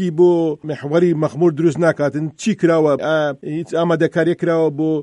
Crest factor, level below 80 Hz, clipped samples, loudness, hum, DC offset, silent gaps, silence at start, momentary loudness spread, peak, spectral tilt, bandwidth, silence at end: 14 dB; -62 dBFS; under 0.1%; -17 LUFS; none; under 0.1%; none; 0 s; 7 LU; -2 dBFS; -7 dB/octave; 10.5 kHz; 0 s